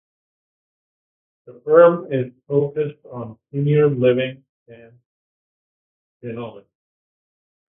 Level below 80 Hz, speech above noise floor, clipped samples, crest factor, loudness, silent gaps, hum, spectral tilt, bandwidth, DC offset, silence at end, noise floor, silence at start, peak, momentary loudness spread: -64 dBFS; over 71 dB; under 0.1%; 22 dB; -18 LUFS; 4.49-4.66 s, 5.06-6.20 s; none; -12 dB/octave; 3.7 kHz; under 0.1%; 1.15 s; under -90 dBFS; 1.5 s; 0 dBFS; 21 LU